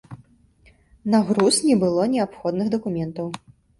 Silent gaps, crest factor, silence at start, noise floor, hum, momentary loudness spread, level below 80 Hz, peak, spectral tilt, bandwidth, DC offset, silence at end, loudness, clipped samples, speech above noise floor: none; 16 dB; 0.1 s; -56 dBFS; none; 14 LU; -58 dBFS; -6 dBFS; -5 dB/octave; 11.5 kHz; under 0.1%; 0.45 s; -21 LUFS; under 0.1%; 35 dB